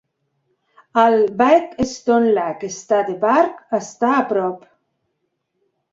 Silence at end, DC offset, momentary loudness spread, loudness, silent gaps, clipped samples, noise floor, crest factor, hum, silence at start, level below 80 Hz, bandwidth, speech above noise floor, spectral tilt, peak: 1.35 s; under 0.1%; 10 LU; -18 LUFS; none; under 0.1%; -73 dBFS; 18 dB; none; 0.95 s; -54 dBFS; 7.8 kHz; 56 dB; -5 dB/octave; -2 dBFS